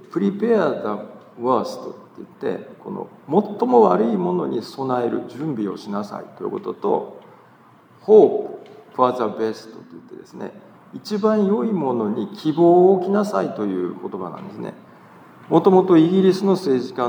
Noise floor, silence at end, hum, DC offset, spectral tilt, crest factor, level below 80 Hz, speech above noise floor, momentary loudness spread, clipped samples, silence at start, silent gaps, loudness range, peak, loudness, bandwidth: -50 dBFS; 0 s; none; under 0.1%; -8 dB/octave; 18 dB; -80 dBFS; 31 dB; 21 LU; under 0.1%; 0.15 s; none; 6 LU; -2 dBFS; -19 LUFS; 10 kHz